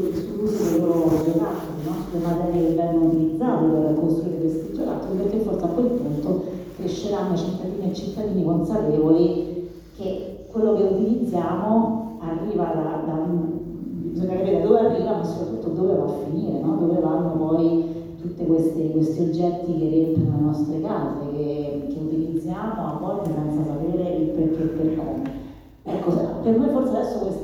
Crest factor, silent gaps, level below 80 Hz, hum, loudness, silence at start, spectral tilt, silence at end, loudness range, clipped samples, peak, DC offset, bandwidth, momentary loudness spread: 20 dB; none; -48 dBFS; none; -23 LUFS; 0 s; -9 dB/octave; 0 s; 3 LU; under 0.1%; -2 dBFS; under 0.1%; 18 kHz; 9 LU